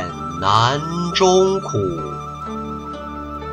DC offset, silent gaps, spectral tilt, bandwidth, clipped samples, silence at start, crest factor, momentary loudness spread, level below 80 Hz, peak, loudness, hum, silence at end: under 0.1%; none; -5 dB/octave; 8.8 kHz; under 0.1%; 0 s; 18 dB; 15 LU; -42 dBFS; -2 dBFS; -19 LUFS; none; 0 s